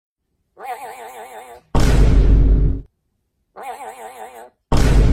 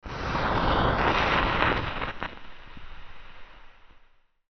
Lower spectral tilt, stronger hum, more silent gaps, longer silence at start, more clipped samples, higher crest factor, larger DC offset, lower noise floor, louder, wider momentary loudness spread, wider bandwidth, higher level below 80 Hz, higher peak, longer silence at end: first, -6.5 dB/octave vs -3 dB/octave; neither; neither; first, 0.6 s vs 0.05 s; neither; second, 14 dB vs 24 dB; neither; first, -70 dBFS vs -59 dBFS; first, -18 LUFS vs -26 LUFS; second, 21 LU vs 24 LU; first, 12.5 kHz vs 6.4 kHz; first, -18 dBFS vs -38 dBFS; about the same, -4 dBFS vs -4 dBFS; second, 0 s vs 0.6 s